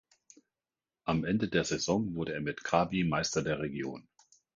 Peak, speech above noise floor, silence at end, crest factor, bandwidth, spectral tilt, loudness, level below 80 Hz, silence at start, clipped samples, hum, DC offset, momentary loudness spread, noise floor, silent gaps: -12 dBFS; over 58 dB; 0.55 s; 22 dB; 9.4 kHz; -5 dB/octave; -32 LUFS; -58 dBFS; 1.05 s; under 0.1%; none; under 0.1%; 9 LU; under -90 dBFS; none